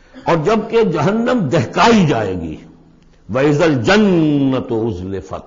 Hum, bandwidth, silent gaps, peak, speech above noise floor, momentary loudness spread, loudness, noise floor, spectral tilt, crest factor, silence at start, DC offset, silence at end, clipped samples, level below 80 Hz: none; 7.6 kHz; none; -2 dBFS; 32 dB; 12 LU; -15 LUFS; -47 dBFS; -6.5 dB/octave; 14 dB; 0.15 s; under 0.1%; 0.05 s; under 0.1%; -42 dBFS